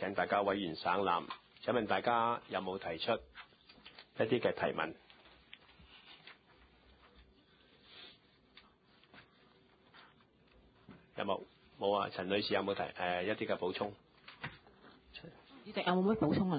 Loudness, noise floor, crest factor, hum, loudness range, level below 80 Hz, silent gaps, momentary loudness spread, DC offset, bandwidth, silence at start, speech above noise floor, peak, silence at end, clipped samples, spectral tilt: -36 LUFS; -67 dBFS; 20 dB; none; 22 LU; -68 dBFS; none; 24 LU; under 0.1%; 4.9 kHz; 0 s; 32 dB; -18 dBFS; 0 s; under 0.1%; -3.5 dB/octave